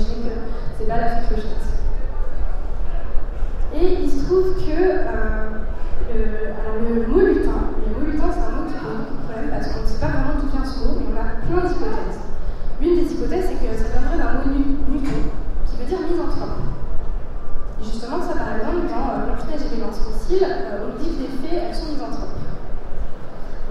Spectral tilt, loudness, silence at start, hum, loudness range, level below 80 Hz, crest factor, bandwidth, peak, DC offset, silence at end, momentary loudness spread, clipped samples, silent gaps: -7.5 dB/octave; -24 LUFS; 0 s; none; 5 LU; -22 dBFS; 14 dB; 6 kHz; -2 dBFS; under 0.1%; 0 s; 12 LU; under 0.1%; none